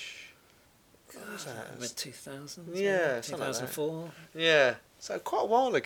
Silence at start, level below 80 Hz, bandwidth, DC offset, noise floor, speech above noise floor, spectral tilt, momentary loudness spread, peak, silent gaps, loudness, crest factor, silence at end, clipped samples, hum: 0 s; -74 dBFS; 20 kHz; under 0.1%; -62 dBFS; 31 dB; -3 dB/octave; 19 LU; -10 dBFS; none; -30 LUFS; 22 dB; 0 s; under 0.1%; none